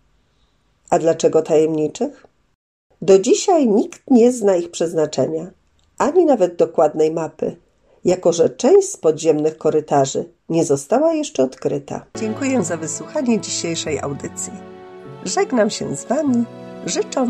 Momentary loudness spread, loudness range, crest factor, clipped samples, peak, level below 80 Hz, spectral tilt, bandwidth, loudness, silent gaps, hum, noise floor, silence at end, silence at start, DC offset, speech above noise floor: 13 LU; 5 LU; 16 dB; under 0.1%; -2 dBFS; -60 dBFS; -5 dB/octave; 12.5 kHz; -18 LUFS; 2.55-2.90 s; none; -61 dBFS; 0 s; 0.9 s; under 0.1%; 44 dB